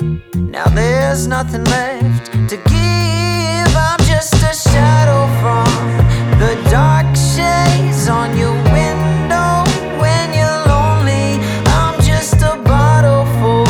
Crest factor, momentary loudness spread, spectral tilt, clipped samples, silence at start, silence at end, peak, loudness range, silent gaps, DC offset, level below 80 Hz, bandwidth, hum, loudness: 12 dB; 5 LU; -5.5 dB/octave; under 0.1%; 0 s; 0 s; 0 dBFS; 2 LU; none; under 0.1%; -22 dBFS; 16.5 kHz; none; -13 LUFS